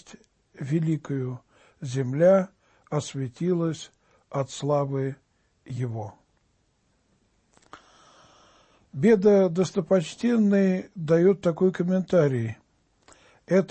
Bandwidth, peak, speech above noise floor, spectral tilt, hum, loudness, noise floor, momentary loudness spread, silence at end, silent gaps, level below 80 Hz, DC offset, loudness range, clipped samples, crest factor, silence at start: 8.8 kHz; -10 dBFS; 45 dB; -7.5 dB/octave; none; -24 LUFS; -69 dBFS; 18 LU; 0.05 s; none; -64 dBFS; under 0.1%; 14 LU; under 0.1%; 16 dB; 0.1 s